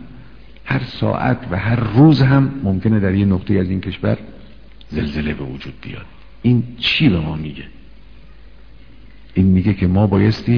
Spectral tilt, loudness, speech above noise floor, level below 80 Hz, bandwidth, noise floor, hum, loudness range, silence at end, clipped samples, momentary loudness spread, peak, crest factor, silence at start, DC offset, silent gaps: -9 dB/octave; -17 LUFS; 27 dB; -38 dBFS; 5.4 kHz; -43 dBFS; none; 6 LU; 0 s; under 0.1%; 16 LU; 0 dBFS; 16 dB; 0 s; 1%; none